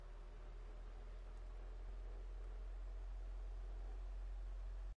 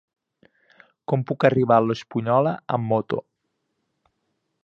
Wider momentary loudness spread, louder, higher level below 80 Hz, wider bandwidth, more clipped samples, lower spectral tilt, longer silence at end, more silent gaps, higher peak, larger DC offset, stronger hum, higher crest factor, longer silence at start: second, 5 LU vs 10 LU; second, -54 LUFS vs -22 LUFS; first, -50 dBFS vs -64 dBFS; second, 6.2 kHz vs 7.4 kHz; neither; second, -6.5 dB/octave vs -8.5 dB/octave; second, 0.05 s vs 1.45 s; neither; second, -42 dBFS vs -2 dBFS; neither; neither; second, 8 dB vs 22 dB; second, 0 s vs 1.1 s